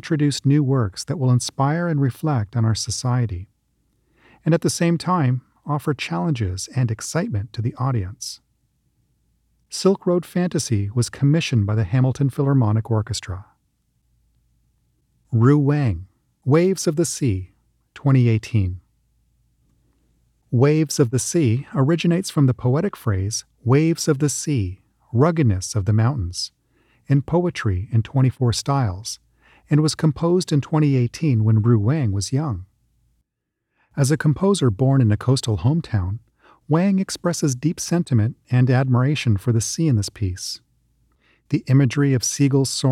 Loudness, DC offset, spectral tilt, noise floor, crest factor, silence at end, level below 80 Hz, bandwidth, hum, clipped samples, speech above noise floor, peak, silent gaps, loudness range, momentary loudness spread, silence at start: -20 LUFS; under 0.1%; -6 dB/octave; -79 dBFS; 16 dB; 0 s; -48 dBFS; 14 kHz; none; under 0.1%; 60 dB; -4 dBFS; none; 4 LU; 9 LU; 0.05 s